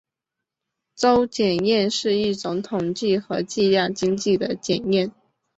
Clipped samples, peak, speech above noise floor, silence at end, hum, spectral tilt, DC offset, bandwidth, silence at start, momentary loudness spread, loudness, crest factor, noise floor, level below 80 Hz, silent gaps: under 0.1%; -4 dBFS; 64 dB; 0.5 s; none; -5 dB/octave; under 0.1%; 8.2 kHz; 1 s; 7 LU; -22 LUFS; 18 dB; -85 dBFS; -58 dBFS; none